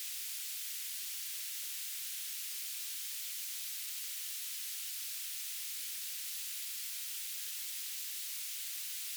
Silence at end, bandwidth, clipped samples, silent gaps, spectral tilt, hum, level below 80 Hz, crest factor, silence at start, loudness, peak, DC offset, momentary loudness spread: 0 s; over 20 kHz; under 0.1%; none; 10 dB/octave; none; under -90 dBFS; 14 dB; 0 s; -38 LUFS; -28 dBFS; under 0.1%; 0 LU